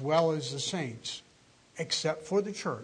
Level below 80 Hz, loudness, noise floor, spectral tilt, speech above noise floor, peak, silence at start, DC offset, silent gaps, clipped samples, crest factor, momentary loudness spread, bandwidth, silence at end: -72 dBFS; -32 LUFS; -62 dBFS; -4 dB/octave; 30 dB; -12 dBFS; 0 s; under 0.1%; none; under 0.1%; 20 dB; 13 LU; 10.5 kHz; 0 s